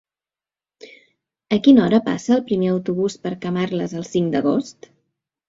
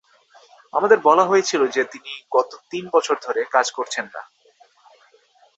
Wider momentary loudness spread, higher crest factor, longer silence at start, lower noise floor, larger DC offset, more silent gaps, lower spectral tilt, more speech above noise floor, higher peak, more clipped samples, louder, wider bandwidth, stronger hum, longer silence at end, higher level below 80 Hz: second, 11 LU vs 15 LU; about the same, 18 dB vs 20 dB; about the same, 0.85 s vs 0.75 s; first, under -90 dBFS vs -57 dBFS; neither; neither; first, -6.5 dB/octave vs -3 dB/octave; first, over 72 dB vs 37 dB; about the same, -2 dBFS vs -2 dBFS; neither; about the same, -19 LUFS vs -20 LUFS; about the same, 7.8 kHz vs 8.2 kHz; neither; second, 0.75 s vs 1.35 s; first, -58 dBFS vs -72 dBFS